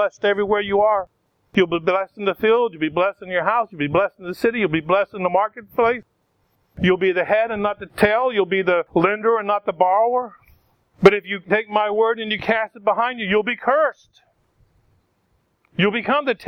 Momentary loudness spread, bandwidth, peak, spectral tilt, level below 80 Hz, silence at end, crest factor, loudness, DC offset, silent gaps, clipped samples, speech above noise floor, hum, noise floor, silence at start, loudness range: 5 LU; 15.5 kHz; 0 dBFS; -6.5 dB/octave; -54 dBFS; 0 s; 20 dB; -20 LUFS; under 0.1%; none; under 0.1%; 47 dB; none; -66 dBFS; 0 s; 3 LU